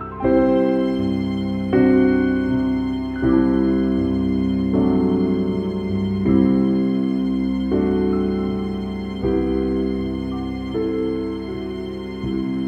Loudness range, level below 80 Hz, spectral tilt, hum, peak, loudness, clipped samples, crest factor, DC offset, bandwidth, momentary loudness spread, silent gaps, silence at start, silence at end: 5 LU; -36 dBFS; -9 dB/octave; none; -4 dBFS; -20 LUFS; under 0.1%; 16 dB; under 0.1%; 5.6 kHz; 9 LU; none; 0 s; 0 s